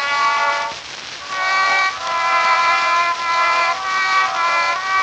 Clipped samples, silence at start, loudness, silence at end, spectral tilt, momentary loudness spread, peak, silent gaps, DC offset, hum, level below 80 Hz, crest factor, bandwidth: under 0.1%; 0 s; -16 LUFS; 0 s; 0.5 dB/octave; 9 LU; -2 dBFS; none; under 0.1%; none; -60 dBFS; 14 dB; 9.2 kHz